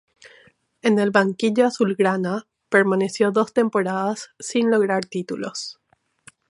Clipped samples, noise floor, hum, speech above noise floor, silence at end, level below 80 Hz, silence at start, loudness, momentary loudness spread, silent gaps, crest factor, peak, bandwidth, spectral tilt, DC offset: under 0.1%; -55 dBFS; none; 35 dB; 0.8 s; -72 dBFS; 0.25 s; -21 LUFS; 11 LU; none; 20 dB; 0 dBFS; 11.5 kHz; -5.5 dB/octave; under 0.1%